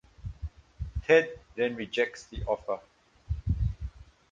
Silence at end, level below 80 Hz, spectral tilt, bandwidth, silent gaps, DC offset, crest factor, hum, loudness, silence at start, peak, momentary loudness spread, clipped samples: 0.3 s; -40 dBFS; -6 dB/octave; 7.6 kHz; none; under 0.1%; 22 dB; none; -30 LUFS; 0.2 s; -8 dBFS; 20 LU; under 0.1%